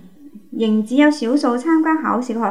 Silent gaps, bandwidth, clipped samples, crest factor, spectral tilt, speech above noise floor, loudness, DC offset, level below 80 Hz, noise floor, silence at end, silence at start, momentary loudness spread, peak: none; 11 kHz; under 0.1%; 16 dB; -5.5 dB/octave; 26 dB; -17 LUFS; 0.5%; -72 dBFS; -42 dBFS; 0 s; 0.25 s; 6 LU; -2 dBFS